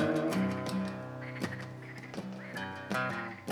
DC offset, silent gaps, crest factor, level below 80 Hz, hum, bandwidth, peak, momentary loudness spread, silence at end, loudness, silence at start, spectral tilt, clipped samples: under 0.1%; none; 20 dB; -72 dBFS; none; 17.5 kHz; -14 dBFS; 11 LU; 0 s; -36 LUFS; 0 s; -6 dB/octave; under 0.1%